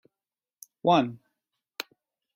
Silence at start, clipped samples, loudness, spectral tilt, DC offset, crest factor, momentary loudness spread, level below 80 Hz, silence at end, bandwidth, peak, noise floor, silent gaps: 0.85 s; under 0.1%; -25 LUFS; -5.5 dB/octave; under 0.1%; 22 dB; 18 LU; -70 dBFS; 1.2 s; 16 kHz; -8 dBFS; under -90 dBFS; none